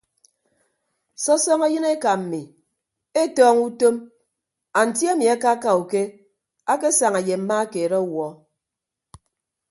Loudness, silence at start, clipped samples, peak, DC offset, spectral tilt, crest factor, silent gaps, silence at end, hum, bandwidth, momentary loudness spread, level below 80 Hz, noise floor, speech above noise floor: -20 LUFS; 1.2 s; under 0.1%; -4 dBFS; under 0.1%; -3.5 dB/octave; 18 dB; none; 1.35 s; none; 11.5 kHz; 12 LU; -68 dBFS; -85 dBFS; 65 dB